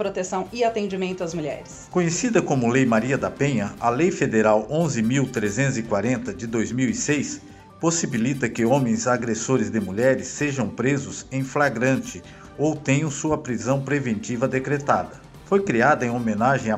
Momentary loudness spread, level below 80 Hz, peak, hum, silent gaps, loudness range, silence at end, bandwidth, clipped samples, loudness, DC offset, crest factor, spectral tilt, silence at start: 7 LU; -54 dBFS; -4 dBFS; none; none; 3 LU; 0 s; 13.5 kHz; under 0.1%; -23 LUFS; under 0.1%; 18 dB; -5.5 dB/octave; 0 s